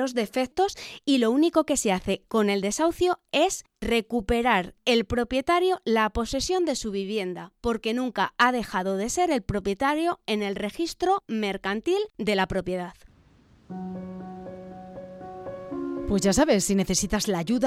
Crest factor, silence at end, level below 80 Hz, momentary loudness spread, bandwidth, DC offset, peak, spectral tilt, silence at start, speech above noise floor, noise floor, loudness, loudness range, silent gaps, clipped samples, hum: 18 dB; 0 s; -46 dBFS; 15 LU; 16 kHz; under 0.1%; -8 dBFS; -4 dB/octave; 0 s; 32 dB; -57 dBFS; -25 LUFS; 7 LU; none; under 0.1%; none